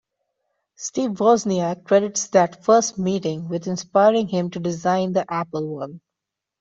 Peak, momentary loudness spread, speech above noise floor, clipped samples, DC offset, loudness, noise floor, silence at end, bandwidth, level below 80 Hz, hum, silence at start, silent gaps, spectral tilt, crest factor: -4 dBFS; 10 LU; 64 dB; under 0.1%; under 0.1%; -21 LUFS; -85 dBFS; 0.6 s; 8.2 kHz; -62 dBFS; none; 0.8 s; none; -5 dB/octave; 18 dB